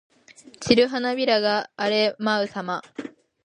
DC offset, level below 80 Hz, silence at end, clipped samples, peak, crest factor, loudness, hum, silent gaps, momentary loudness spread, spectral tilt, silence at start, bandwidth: under 0.1%; -60 dBFS; 0.35 s; under 0.1%; -2 dBFS; 22 dB; -22 LUFS; none; none; 17 LU; -4 dB/octave; 0.6 s; 10.5 kHz